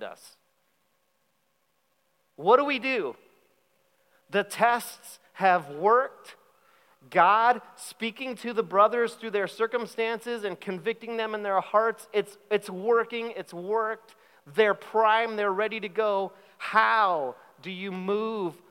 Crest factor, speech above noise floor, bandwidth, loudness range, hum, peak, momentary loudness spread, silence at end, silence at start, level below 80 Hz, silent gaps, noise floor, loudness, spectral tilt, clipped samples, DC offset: 22 dB; 47 dB; 16.5 kHz; 4 LU; none; -6 dBFS; 14 LU; 0.15 s; 0 s; under -90 dBFS; none; -73 dBFS; -26 LUFS; -4.5 dB/octave; under 0.1%; under 0.1%